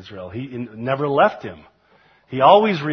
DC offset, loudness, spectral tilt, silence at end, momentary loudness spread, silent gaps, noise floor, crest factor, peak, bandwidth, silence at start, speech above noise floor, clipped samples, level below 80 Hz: under 0.1%; -17 LUFS; -7.5 dB/octave; 0 s; 20 LU; none; -56 dBFS; 20 dB; 0 dBFS; 6.4 kHz; 0.05 s; 37 dB; under 0.1%; -60 dBFS